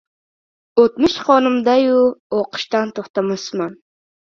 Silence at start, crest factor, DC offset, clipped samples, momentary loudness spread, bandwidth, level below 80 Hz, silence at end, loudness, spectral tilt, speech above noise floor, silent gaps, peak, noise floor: 0.75 s; 18 dB; under 0.1%; under 0.1%; 9 LU; 7.4 kHz; -56 dBFS; 0.55 s; -17 LUFS; -5 dB/octave; over 74 dB; 2.20-2.30 s, 3.10-3.14 s; 0 dBFS; under -90 dBFS